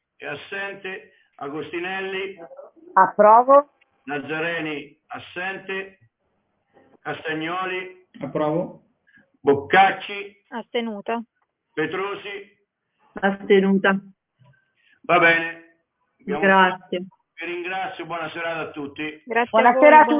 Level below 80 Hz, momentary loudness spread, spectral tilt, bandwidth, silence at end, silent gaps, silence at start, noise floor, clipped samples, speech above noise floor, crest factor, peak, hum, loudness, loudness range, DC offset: -68 dBFS; 20 LU; -9 dB/octave; 3.9 kHz; 0 s; none; 0.2 s; -71 dBFS; under 0.1%; 51 dB; 20 dB; -2 dBFS; none; -21 LUFS; 11 LU; under 0.1%